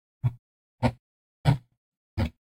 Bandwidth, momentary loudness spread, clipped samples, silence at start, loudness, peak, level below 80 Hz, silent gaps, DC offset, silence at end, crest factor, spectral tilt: 14.5 kHz; 6 LU; under 0.1%; 0.25 s; -30 LUFS; -8 dBFS; -46 dBFS; 0.39-0.78 s, 0.99-1.44 s, 1.77-2.17 s; under 0.1%; 0.25 s; 24 dB; -8 dB/octave